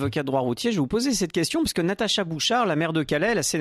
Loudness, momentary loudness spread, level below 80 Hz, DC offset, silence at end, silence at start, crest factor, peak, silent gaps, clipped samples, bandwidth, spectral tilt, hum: -24 LUFS; 3 LU; -50 dBFS; under 0.1%; 0 s; 0 s; 12 dB; -12 dBFS; none; under 0.1%; 14 kHz; -4 dB/octave; none